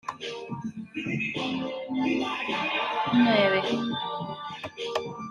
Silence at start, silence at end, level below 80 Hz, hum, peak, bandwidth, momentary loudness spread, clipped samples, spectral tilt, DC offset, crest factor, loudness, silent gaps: 0.05 s; 0 s; -68 dBFS; none; -10 dBFS; 10.5 kHz; 14 LU; under 0.1%; -5.5 dB/octave; under 0.1%; 18 dB; -28 LUFS; none